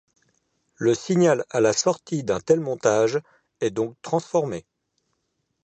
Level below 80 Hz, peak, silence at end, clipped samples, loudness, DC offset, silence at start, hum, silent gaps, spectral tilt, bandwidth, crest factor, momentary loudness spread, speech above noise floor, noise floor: -62 dBFS; -4 dBFS; 1.05 s; under 0.1%; -23 LUFS; under 0.1%; 0.8 s; none; none; -5 dB/octave; 9 kHz; 20 dB; 9 LU; 53 dB; -75 dBFS